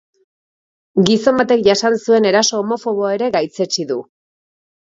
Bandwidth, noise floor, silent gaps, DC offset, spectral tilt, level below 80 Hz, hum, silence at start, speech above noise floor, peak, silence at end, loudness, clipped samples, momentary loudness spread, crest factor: 7.8 kHz; under -90 dBFS; none; under 0.1%; -4 dB/octave; -58 dBFS; none; 0.95 s; over 75 dB; 0 dBFS; 0.85 s; -16 LUFS; under 0.1%; 7 LU; 16 dB